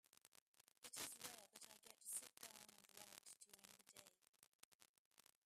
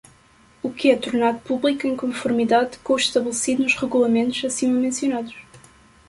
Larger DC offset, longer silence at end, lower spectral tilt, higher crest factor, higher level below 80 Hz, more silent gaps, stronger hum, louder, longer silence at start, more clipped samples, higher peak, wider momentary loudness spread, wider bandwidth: neither; second, 0.25 s vs 0.5 s; second, 0 dB/octave vs -3 dB/octave; first, 26 dB vs 18 dB; second, under -90 dBFS vs -58 dBFS; first, 0.28-0.32 s, 0.41-0.54 s, 0.78-0.82 s, 4.29-4.59 s, 4.65-4.79 s, 4.89-5.11 s vs none; neither; second, -57 LUFS vs -21 LUFS; second, 0.15 s vs 0.65 s; neither; second, -36 dBFS vs -4 dBFS; first, 14 LU vs 6 LU; first, 15.5 kHz vs 11.5 kHz